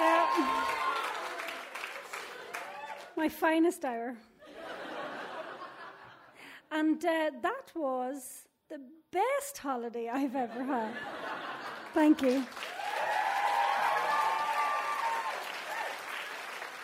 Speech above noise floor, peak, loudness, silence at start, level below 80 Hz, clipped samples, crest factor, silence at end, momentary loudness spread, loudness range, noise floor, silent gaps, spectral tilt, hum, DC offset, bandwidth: 22 dB; -14 dBFS; -33 LUFS; 0 s; -76 dBFS; under 0.1%; 18 dB; 0 s; 17 LU; 5 LU; -54 dBFS; none; -3 dB/octave; none; under 0.1%; 16 kHz